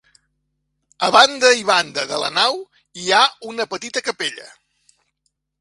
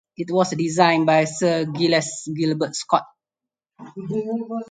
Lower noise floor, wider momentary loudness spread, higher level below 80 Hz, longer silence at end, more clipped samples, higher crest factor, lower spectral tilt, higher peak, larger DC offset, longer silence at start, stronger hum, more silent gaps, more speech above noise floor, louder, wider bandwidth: second, -72 dBFS vs -88 dBFS; first, 15 LU vs 11 LU; about the same, -66 dBFS vs -68 dBFS; first, 1.15 s vs 0.05 s; neither; about the same, 20 dB vs 20 dB; second, -1 dB/octave vs -5 dB/octave; about the same, 0 dBFS vs -2 dBFS; neither; first, 1 s vs 0.2 s; neither; neither; second, 55 dB vs 67 dB; first, -17 LUFS vs -21 LUFS; first, 11.5 kHz vs 9.6 kHz